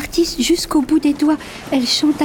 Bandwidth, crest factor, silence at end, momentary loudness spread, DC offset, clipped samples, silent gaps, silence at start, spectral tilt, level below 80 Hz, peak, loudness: 19 kHz; 12 dB; 0 s; 5 LU; under 0.1%; under 0.1%; none; 0 s; -3 dB/octave; -40 dBFS; -6 dBFS; -17 LUFS